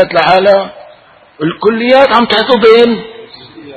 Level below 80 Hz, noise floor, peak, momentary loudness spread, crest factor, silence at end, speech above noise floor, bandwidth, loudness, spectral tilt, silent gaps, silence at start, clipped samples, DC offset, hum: -46 dBFS; -40 dBFS; 0 dBFS; 13 LU; 10 dB; 0 s; 32 dB; 9 kHz; -8 LUFS; -6 dB/octave; none; 0 s; 0.7%; under 0.1%; none